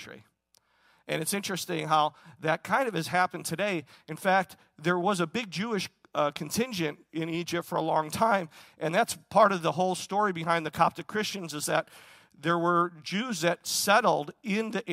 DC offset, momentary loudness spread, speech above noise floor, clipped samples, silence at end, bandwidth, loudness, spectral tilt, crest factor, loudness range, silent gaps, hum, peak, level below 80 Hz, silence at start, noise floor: under 0.1%; 10 LU; 40 dB; under 0.1%; 0 s; 16 kHz; -28 LUFS; -4 dB/octave; 20 dB; 3 LU; none; none; -8 dBFS; -70 dBFS; 0 s; -68 dBFS